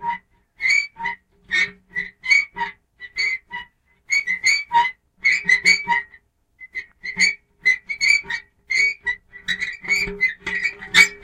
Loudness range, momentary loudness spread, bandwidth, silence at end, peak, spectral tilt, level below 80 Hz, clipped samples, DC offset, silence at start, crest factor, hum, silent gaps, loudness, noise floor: 3 LU; 15 LU; 16 kHz; 0.05 s; -2 dBFS; 0 dB/octave; -52 dBFS; under 0.1%; under 0.1%; 0 s; 20 dB; none; none; -19 LUFS; -53 dBFS